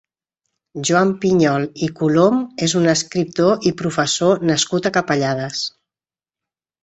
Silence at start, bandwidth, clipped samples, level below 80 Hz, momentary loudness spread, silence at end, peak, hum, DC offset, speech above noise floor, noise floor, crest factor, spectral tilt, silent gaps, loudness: 0.75 s; 8.4 kHz; under 0.1%; -56 dBFS; 8 LU; 1.15 s; -2 dBFS; none; under 0.1%; over 73 dB; under -90 dBFS; 16 dB; -4.5 dB/octave; none; -18 LUFS